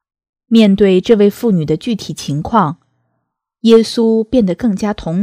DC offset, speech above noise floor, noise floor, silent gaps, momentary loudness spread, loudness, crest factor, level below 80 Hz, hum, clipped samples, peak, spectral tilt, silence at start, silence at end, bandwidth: under 0.1%; 59 dB; -71 dBFS; none; 10 LU; -13 LUFS; 14 dB; -42 dBFS; none; 0.4%; 0 dBFS; -7 dB/octave; 0.5 s; 0 s; 15 kHz